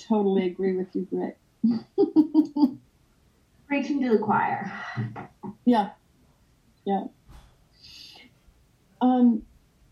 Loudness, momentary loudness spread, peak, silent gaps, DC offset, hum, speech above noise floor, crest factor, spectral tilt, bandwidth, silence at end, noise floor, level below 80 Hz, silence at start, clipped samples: -25 LUFS; 19 LU; -8 dBFS; none; under 0.1%; none; 38 dB; 18 dB; -8 dB/octave; 7 kHz; 0.5 s; -62 dBFS; -62 dBFS; 0 s; under 0.1%